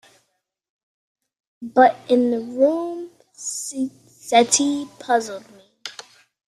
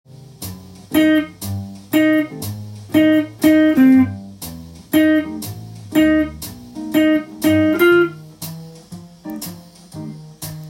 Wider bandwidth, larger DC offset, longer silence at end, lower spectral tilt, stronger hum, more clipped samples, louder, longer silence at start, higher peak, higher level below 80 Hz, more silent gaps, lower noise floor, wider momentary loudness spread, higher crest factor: second, 14 kHz vs 17 kHz; neither; first, 0.55 s vs 0 s; second, -2 dB/octave vs -5.5 dB/octave; neither; neither; second, -20 LUFS vs -16 LUFS; first, 1.6 s vs 0.15 s; about the same, -2 dBFS vs -2 dBFS; second, -70 dBFS vs -50 dBFS; neither; first, -73 dBFS vs -37 dBFS; about the same, 21 LU vs 21 LU; about the same, 20 dB vs 16 dB